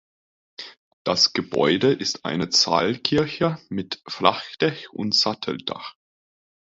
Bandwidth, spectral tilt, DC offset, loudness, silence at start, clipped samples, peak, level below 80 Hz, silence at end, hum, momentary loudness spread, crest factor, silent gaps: 7.8 kHz; -3.5 dB/octave; under 0.1%; -22 LUFS; 0.6 s; under 0.1%; 0 dBFS; -58 dBFS; 0.75 s; none; 15 LU; 24 dB; 0.78-1.05 s